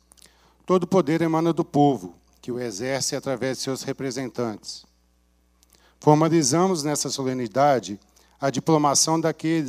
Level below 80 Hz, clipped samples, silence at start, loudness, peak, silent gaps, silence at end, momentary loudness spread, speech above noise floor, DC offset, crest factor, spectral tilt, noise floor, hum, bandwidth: -64 dBFS; under 0.1%; 0.7 s; -23 LUFS; -2 dBFS; none; 0 s; 13 LU; 41 dB; under 0.1%; 22 dB; -4.5 dB/octave; -63 dBFS; 60 Hz at -60 dBFS; 16 kHz